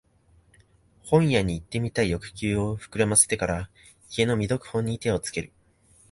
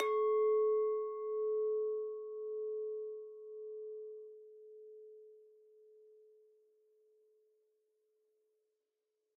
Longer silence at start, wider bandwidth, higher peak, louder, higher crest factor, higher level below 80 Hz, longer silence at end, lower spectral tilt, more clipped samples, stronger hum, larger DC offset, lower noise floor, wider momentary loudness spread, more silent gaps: first, 1.05 s vs 0 s; first, 12 kHz vs 3.3 kHz; first, -4 dBFS vs -22 dBFS; first, -25 LUFS vs -37 LUFS; about the same, 22 dB vs 18 dB; first, -46 dBFS vs under -90 dBFS; second, 0.65 s vs 3.95 s; first, -4.5 dB/octave vs 5.5 dB/octave; neither; neither; neither; second, -60 dBFS vs -87 dBFS; second, 13 LU vs 24 LU; neither